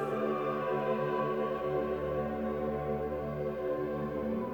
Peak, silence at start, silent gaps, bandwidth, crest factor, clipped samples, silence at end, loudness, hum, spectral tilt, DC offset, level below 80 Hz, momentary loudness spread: -20 dBFS; 0 s; none; over 20 kHz; 12 dB; under 0.1%; 0 s; -34 LUFS; none; -8.5 dB/octave; under 0.1%; -54 dBFS; 3 LU